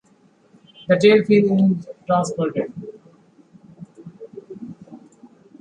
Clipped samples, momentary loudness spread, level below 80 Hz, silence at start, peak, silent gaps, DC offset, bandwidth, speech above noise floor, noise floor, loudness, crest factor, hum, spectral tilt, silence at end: under 0.1%; 27 LU; -64 dBFS; 0.9 s; -2 dBFS; none; under 0.1%; 9.6 kHz; 39 dB; -56 dBFS; -18 LUFS; 20 dB; none; -6.5 dB/octave; 0.65 s